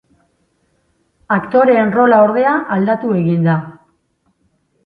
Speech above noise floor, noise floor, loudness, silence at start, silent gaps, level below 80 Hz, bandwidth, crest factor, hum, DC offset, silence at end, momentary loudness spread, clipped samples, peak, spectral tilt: 50 dB; -62 dBFS; -13 LUFS; 1.3 s; none; -58 dBFS; 5 kHz; 16 dB; none; under 0.1%; 1.15 s; 8 LU; under 0.1%; 0 dBFS; -10.5 dB/octave